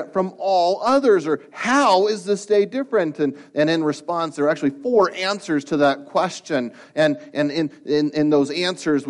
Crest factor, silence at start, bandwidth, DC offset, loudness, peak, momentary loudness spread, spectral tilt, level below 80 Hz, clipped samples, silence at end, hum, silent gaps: 14 dB; 0 s; 11.5 kHz; under 0.1%; -20 LUFS; -6 dBFS; 7 LU; -5 dB/octave; -68 dBFS; under 0.1%; 0 s; none; none